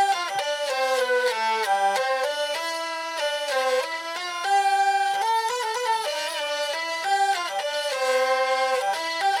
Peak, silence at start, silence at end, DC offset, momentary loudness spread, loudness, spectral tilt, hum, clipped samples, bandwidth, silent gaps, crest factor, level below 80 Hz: -12 dBFS; 0 s; 0 s; under 0.1%; 5 LU; -24 LUFS; 1 dB/octave; none; under 0.1%; 17.5 kHz; none; 12 dB; -78 dBFS